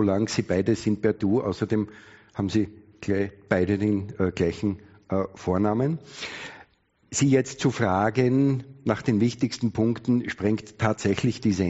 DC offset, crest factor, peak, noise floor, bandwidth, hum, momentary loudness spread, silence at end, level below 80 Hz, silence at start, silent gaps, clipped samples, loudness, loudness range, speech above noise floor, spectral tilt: under 0.1%; 20 dB; -4 dBFS; -62 dBFS; 8 kHz; none; 10 LU; 0 s; -54 dBFS; 0 s; none; under 0.1%; -25 LUFS; 3 LU; 37 dB; -6.5 dB/octave